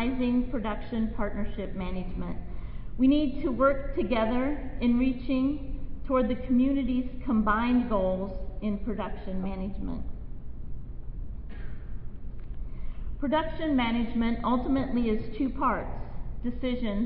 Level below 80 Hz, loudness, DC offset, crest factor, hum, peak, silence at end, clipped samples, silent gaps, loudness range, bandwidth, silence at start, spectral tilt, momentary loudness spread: -36 dBFS; -29 LUFS; under 0.1%; 18 dB; none; -10 dBFS; 0 s; under 0.1%; none; 11 LU; 4.7 kHz; 0 s; -11 dB/octave; 17 LU